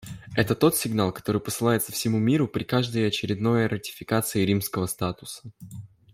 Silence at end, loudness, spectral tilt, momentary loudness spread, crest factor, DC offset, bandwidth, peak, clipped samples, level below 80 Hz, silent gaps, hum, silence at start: 0.25 s; -25 LUFS; -5 dB/octave; 16 LU; 18 dB; under 0.1%; 16 kHz; -6 dBFS; under 0.1%; -56 dBFS; none; none; 0 s